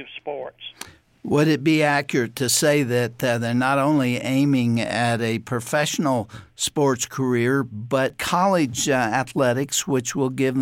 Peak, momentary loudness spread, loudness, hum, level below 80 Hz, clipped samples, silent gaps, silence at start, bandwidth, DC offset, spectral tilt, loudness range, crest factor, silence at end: -6 dBFS; 12 LU; -21 LUFS; none; -58 dBFS; under 0.1%; none; 0 s; 17 kHz; under 0.1%; -4.5 dB/octave; 2 LU; 16 dB; 0 s